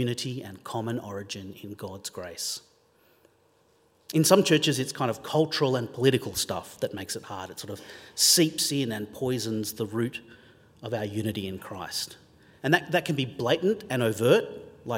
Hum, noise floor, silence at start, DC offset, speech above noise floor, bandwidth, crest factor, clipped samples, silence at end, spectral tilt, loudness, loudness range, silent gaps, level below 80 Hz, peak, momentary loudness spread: none; -64 dBFS; 0 s; under 0.1%; 37 dB; 16.5 kHz; 24 dB; under 0.1%; 0 s; -4 dB/octave; -27 LUFS; 9 LU; none; -66 dBFS; -4 dBFS; 17 LU